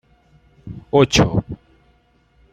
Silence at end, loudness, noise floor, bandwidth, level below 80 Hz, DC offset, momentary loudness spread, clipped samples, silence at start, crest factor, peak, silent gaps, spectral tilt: 1 s; -17 LUFS; -58 dBFS; 15 kHz; -40 dBFS; under 0.1%; 23 LU; under 0.1%; 0.65 s; 20 dB; -2 dBFS; none; -5 dB/octave